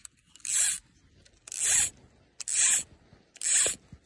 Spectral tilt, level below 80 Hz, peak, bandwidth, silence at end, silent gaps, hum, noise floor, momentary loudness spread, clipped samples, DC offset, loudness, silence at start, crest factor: 2 dB/octave; -62 dBFS; -12 dBFS; 11.5 kHz; 0.1 s; none; none; -61 dBFS; 16 LU; under 0.1%; under 0.1%; -25 LUFS; 0.45 s; 20 dB